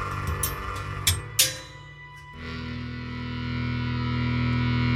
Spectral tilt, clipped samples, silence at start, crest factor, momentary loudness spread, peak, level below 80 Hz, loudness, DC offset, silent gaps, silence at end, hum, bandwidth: -3.5 dB/octave; under 0.1%; 0 s; 24 dB; 18 LU; -4 dBFS; -40 dBFS; -27 LUFS; under 0.1%; none; 0 s; none; 16 kHz